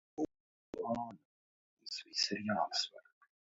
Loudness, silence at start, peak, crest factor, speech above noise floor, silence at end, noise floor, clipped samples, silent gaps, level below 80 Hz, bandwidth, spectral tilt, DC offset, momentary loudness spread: -38 LUFS; 0.15 s; -20 dBFS; 22 dB; over 52 dB; 0.5 s; under -90 dBFS; under 0.1%; 0.40-0.73 s, 1.25-1.77 s; -76 dBFS; 7.6 kHz; -2 dB/octave; under 0.1%; 12 LU